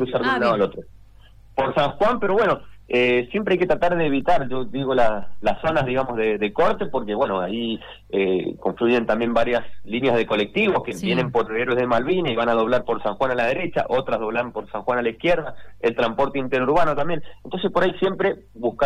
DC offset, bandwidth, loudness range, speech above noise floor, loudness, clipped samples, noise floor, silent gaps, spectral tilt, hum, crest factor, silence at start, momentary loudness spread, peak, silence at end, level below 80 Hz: under 0.1%; 11.5 kHz; 2 LU; 26 dB; -22 LUFS; under 0.1%; -47 dBFS; none; -6.5 dB/octave; none; 16 dB; 0 s; 7 LU; -6 dBFS; 0 s; -46 dBFS